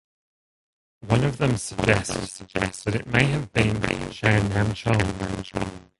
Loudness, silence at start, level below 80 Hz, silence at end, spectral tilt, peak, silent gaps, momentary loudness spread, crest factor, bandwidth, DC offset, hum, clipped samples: -24 LUFS; 1.05 s; -42 dBFS; 0.2 s; -5.5 dB/octave; -2 dBFS; none; 9 LU; 22 dB; 11.5 kHz; under 0.1%; none; under 0.1%